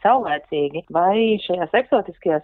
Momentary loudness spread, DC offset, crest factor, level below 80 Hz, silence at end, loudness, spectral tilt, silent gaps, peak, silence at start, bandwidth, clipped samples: 6 LU; under 0.1%; 16 dB; -58 dBFS; 0 s; -20 LUFS; -8.5 dB/octave; none; -4 dBFS; 0.05 s; 4.3 kHz; under 0.1%